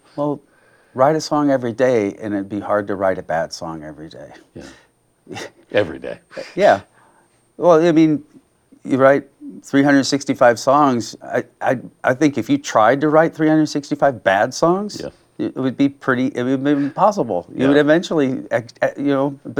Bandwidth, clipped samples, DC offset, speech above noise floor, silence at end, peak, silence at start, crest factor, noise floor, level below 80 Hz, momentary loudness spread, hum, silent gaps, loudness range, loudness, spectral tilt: 12.5 kHz; under 0.1%; under 0.1%; 39 dB; 0 s; 0 dBFS; 0.15 s; 16 dB; -56 dBFS; -58 dBFS; 17 LU; none; none; 7 LU; -17 LUFS; -5.5 dB/octave